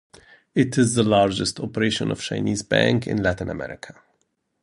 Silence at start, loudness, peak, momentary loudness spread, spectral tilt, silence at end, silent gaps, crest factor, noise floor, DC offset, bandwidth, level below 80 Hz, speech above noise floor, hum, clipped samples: 0.55 s; -22 LUFS; -2 dBFS; 13 LU; -5 dB/octave; 0.7 s; none; 20 dB; -71 dBFS; under 0.1%; 11.5 kHz; -48 dBFS; 50 dB; none; under 0.1%